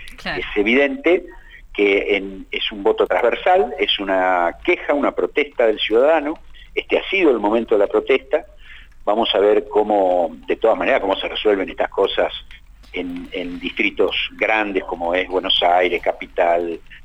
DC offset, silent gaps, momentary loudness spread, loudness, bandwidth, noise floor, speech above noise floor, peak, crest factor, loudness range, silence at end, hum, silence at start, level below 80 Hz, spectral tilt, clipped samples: under 0.1%; none; 11 LU; -18 LUFS; 8.8 kHz; -40 dBFS; 21 dB; -4 dBFS; 14 dB; 3 LU; 0.05 s; none; 0 s; -44 dBFS; -5 dB/octave; under 0.1%